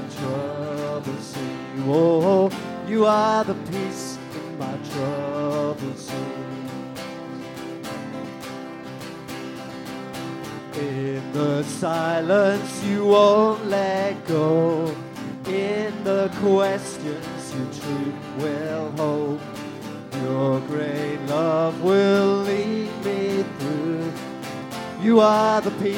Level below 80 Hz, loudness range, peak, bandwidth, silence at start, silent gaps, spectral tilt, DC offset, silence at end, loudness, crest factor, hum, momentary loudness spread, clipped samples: -62 dBFS; 12 LU; -4 dBFS; 17 kHz; 0 s; none; -6 dB/octave; under 0.1%; 0 s; -23 LUFS; 20 dB; none; 16 LU; under 0.1%